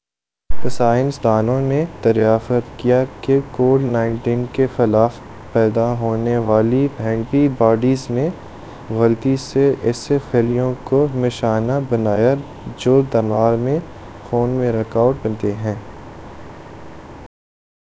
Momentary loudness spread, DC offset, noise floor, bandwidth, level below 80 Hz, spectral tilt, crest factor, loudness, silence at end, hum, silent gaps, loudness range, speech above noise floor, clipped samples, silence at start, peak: 20 LU; under 0.1%; -87 dBFS; 8 kHz; -42 dBFS; -8 dB/octave; 18 dB; -18 LUFS; 0.6 s; none; none; 3 LU; 70 dB; under 0.1%; 0.5 s; 0 dBFS